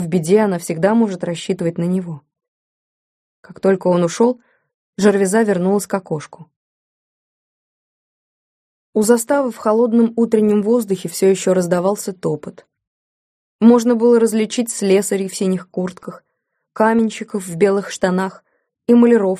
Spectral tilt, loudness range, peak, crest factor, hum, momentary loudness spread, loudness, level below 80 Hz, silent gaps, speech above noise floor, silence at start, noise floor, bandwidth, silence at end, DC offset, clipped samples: -6 dB/octave; 5 LU; -2 dBFS; 16 dB; none; 12 LU; -16 LUFS; -62 dBFS; 2.48-3.43 s, 4.74-4.93 s, 6.56-8.93 s, 12.87-13.59 s; 52 dB; 0 s; -67 dBFS; 15.5 kHz; 0 s; under 0.1%; under 0.1%